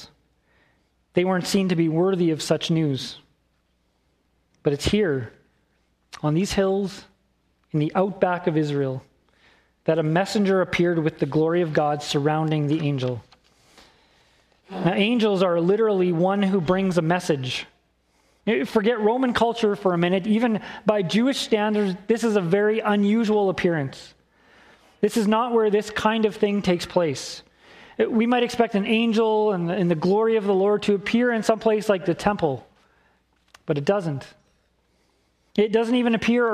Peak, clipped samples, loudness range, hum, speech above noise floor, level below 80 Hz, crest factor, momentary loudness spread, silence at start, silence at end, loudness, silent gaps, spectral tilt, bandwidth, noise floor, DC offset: -2 dBFS; under 0.1%; 5 LU; none; 46 dB; -54 dBFS; 20 dB; 9 LU; 0 s; 0 s; -22 LUFS; none; -6 dB/octave; 14.5 kHz; -68 dBFS; under 0.1%